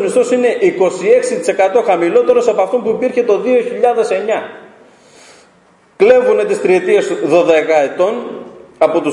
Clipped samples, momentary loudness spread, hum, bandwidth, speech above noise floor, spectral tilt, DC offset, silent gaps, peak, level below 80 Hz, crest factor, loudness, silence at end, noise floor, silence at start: under 0.1%; 6 LU; none; 11 kHz; 37 dB; -5 dB/octave; under 0.1%; none; 0 dBFS; -60 dBFS; 12 dB; -13 LUFS; 0 s; -49 dBFS; 0 s